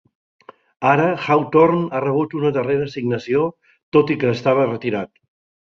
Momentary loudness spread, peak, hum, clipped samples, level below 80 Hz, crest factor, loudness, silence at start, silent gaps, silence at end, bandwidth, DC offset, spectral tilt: 9 LU; -2 dBFS; none; under 0.1%; -58 dBFS; 18 dB; -19 LUFS; 0.8 s; 3.83-3.92 s; 0.55 s; 7 kHz; under 0.1%; -8 dB/octave